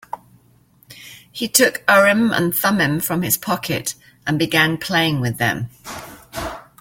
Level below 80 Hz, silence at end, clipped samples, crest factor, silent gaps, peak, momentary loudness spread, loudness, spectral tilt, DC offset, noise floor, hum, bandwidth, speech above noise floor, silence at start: -50 dBFS; 0.2 s; under 0.1%; 20 dB; none; 0 dBFS; 20 LU; -17 LUFS; -3.5 dB/octave; under 0.1%; -54 dBFS; none; 17 kHz; 36 dB; 0.15 s